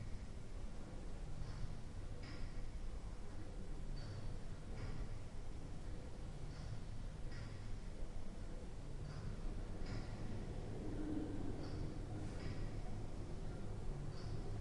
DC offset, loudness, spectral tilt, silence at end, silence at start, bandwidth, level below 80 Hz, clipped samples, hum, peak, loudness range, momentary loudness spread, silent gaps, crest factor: under 0.1%; -50 LUFS; -6.5 dB/octave; 0 s; 0 s; 11 kHz; -48 dBFS; under 0.1%; none; -32 dBFS; 4 LU; 5 LU; none; 14 dB